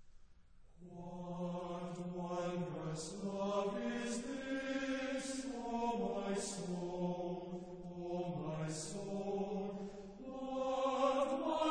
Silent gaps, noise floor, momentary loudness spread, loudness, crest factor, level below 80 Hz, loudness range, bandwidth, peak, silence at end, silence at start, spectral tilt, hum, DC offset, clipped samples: none; -61 dBFS; 11 LU; -41 LUFS; 18 dB; -64 dBFS; 3 LU; 9.8 kHz; -22 dBFS; 0 s; 0 s; -5.5 dB/octave; none; under 0.1%; under 0.1%